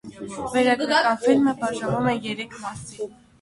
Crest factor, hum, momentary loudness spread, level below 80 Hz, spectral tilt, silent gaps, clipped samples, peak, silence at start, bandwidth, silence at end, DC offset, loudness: 18 dB; none; 15 LU; -56 dBFS; -5 dB/octave; none; under 0.1%; -6 dBFS; 0.05 s; 11.5 kHz; 0.3 s; under 0.1%; -22 LUFS